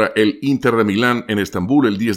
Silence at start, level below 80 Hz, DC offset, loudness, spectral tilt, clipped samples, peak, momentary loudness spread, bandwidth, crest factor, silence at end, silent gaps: 0 s; -52 dBFS; under 0.1%; -17 LUFS; -6 dB/octave; under 0.1%; -2 dBFS; 4 LU; 15.5 kHz; 14 dB; 0 s; none